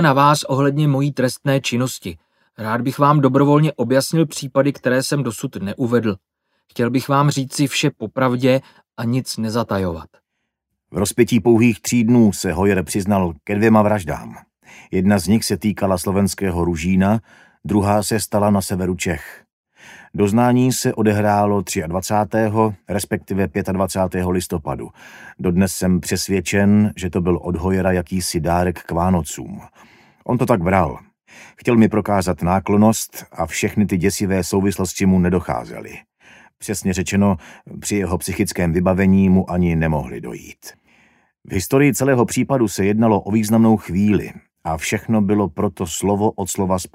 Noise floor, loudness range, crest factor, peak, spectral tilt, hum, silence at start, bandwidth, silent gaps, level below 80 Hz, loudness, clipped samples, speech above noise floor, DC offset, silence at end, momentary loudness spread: -76 dBFS; 4 LU; 18 dB; 0 dBFS; -6 dB/octave; none; 0 s; 16 kHz; 19.53-19.64 s; -42 dBFS; -18 LUFS; under 0.1%; 59 dB; under 0.1%; 0.1 s; 12 LU